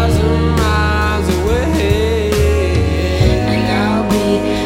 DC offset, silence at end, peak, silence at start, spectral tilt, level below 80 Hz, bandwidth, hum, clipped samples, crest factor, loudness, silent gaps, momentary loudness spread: under 0.1%; 0 s; 0 dBFS; 0 s; -6 dB/octave; -20 dBFS; 16 kHz; none; under 0.1%; 14 dB; -14 LUFS; none; 1 LU